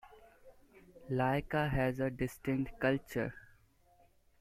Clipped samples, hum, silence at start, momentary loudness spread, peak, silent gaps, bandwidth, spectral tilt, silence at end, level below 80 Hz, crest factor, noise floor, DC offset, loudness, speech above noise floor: under 0.1%; none; 0.05 s; 6 LU; -16 dBFS; none; 15.5 kHz; -7 dB/octave; 1 s; -54 dBFS; 20 dB; -67 dBFS; under 0.1%; -35 LUFS; 33 dB